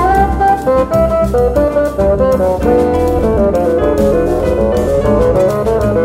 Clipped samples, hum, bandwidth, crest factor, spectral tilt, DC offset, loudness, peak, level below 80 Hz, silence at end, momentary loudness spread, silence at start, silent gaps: under 0.1%; none; 16 kHz; 10 dB; -7.5 dB/octave; under 0.1%; -12 LUFS; 0 dBFS; -22 dBFS; 0 s; 2 LU; 0 s; none